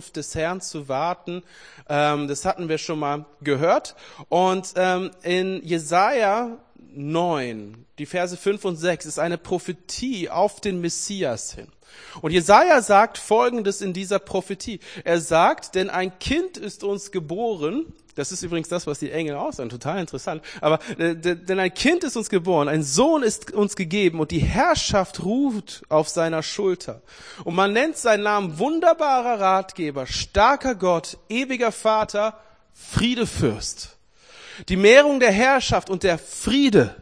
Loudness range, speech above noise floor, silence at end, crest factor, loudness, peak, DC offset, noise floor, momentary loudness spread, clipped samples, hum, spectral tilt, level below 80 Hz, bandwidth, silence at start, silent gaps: 7 LU; 27 dB; 0 s; 22 dB; -22 LUFS; 0 dBFS; 0.1%; -49 dBFS; 13 LU; under 0.1%; none; -4.5 dB/octave; -44 dBFS; 10.5 kHz; 0 s; none